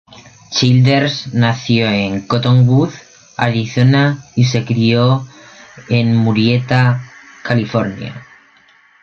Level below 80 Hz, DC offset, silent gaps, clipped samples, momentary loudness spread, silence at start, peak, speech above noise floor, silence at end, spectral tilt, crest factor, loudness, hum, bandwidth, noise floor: -50 dBFS; under 0.1%; none; under 0.1%; 11 LU; 0.5 s; -2 dBFS; 36 dB; 0.8 s; -6.5 dB/octave; 14 dB; -14 LUFS; none; 7 kHz; -49 dBFS